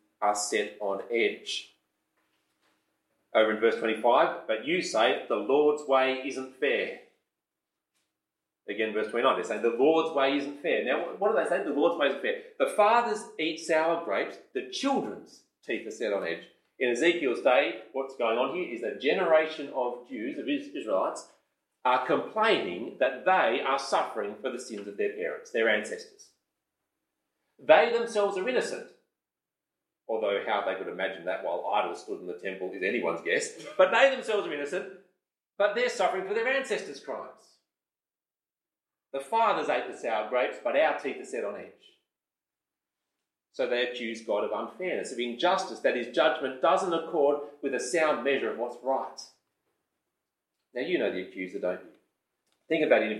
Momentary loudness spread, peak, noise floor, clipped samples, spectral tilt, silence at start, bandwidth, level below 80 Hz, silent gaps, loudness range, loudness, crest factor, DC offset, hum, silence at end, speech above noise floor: 12 LU; -6 dBFS; under -90 dBFS; under 0.1%; -3.5 dB/octave; 0.2 s; 12.5 kHz; under -90 dBFS; none; 6 LU; -28 LUFS; 24 dB; under 0.1%; none; 0 s; over 62 dB